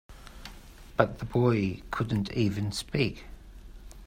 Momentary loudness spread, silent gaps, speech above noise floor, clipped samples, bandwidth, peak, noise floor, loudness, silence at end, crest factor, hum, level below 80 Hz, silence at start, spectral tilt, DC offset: 21 LU; none; 20 dB; under 0.1%; 16 kHz; -6 dBFS; -48 dBFS; -29 LUFS; 0 s; 26 dB; none; -48 dBFS; 0.1 s; -6.5 dB/octave; under 0.1%